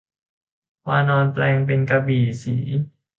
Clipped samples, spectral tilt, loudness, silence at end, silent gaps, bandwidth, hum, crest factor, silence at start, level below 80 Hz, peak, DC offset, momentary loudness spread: under 0.1%; -8 dB/octave; -20 LUFS; 0.3 s; none; 7.4 kHz; none; 16 dB; 0.85 s; -56 dBFS; -6 dBFS; under 0.1%; 7 LU